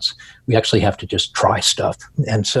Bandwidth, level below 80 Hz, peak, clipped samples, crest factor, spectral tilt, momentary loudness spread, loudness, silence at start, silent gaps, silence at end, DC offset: 12.5 kHz; -46 dBFS; 0 dBFS; under 0.1%; 18 dB; -4 dB/octave; 8 LU; -18 LUFS; 0 s; none; 0 s; under 0.1%